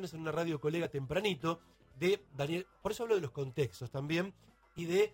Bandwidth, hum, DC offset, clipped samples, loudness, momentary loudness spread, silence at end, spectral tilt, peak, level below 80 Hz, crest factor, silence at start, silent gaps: 16 kHz; none; under 0.1%; under 0.1%; -36 LUFS; 7 LU; 0 s; -6 dB/octave; -18 dBFS; -64 dBFS; 18 dB; 0 s; none